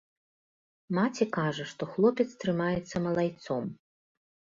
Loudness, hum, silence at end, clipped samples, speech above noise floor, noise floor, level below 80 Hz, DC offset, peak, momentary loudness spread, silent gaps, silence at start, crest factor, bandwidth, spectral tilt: -30 LUFS; none; 0.85 s; under 0.1%; over 61 dB; under -90 dBFS; -64 dBFS; under 0.1%; -12 dBFS; 8 LU; none; 0.9 s; 20 dB; 7.6 kHz; -6.5 dB/octave